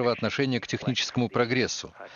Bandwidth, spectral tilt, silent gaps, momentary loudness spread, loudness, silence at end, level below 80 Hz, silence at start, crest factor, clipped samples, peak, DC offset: 7.4 kHz; -4.5 dB/octave; none; 4 LU; -27 LUFS; 0 s; -62 dBFS; 0 s; 18 dB; under 0.1%; -8 dBFS; under 0.1%